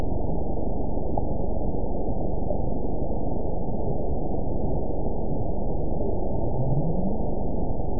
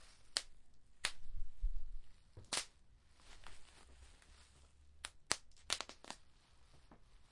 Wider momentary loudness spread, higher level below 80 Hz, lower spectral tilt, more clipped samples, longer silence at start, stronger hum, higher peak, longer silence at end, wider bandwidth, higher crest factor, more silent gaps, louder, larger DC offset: second, 3 LU vs 23 LU; first, -30 dBFS vs -52 dBFS; first, -18 dB/octave vs -0.5 dB/octave; neither; about the same, 0 s vs 0 s; neither; about the same, -10 dBFS vs -10 dBFS; about the same, 0 s vs 0.05 s; second, 1 kHz vs 11.5 kHz; second, 14 dB vs 34 dB; neither; first, -29 LUFS vs -45 LUFS; first, 8% vs under 0.1%